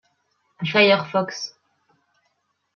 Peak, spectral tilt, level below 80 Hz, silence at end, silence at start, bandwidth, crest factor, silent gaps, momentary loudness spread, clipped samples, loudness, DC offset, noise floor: -2 dBFS; -4.5 dB/octave; -74 dBFS; 1.3 s; 0.6 s; 7 kHz; 22 dB; none; 16 LU; under 0.1%; -20 LUFS; under 0.1%; -71 dBFS